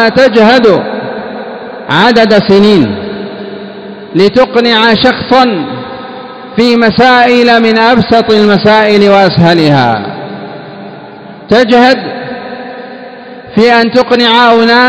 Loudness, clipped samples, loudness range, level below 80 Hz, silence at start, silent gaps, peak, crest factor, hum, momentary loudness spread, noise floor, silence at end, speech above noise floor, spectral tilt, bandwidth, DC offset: -6 LUFS; 6%; 5 LU; -42 dBFS; 0 s; none; 0 dBFS; 8 dB; none; 19 LU; -28 dBFS; 0 s; 22 dB; -6 dB/octave; 8 kHz; under 0.1%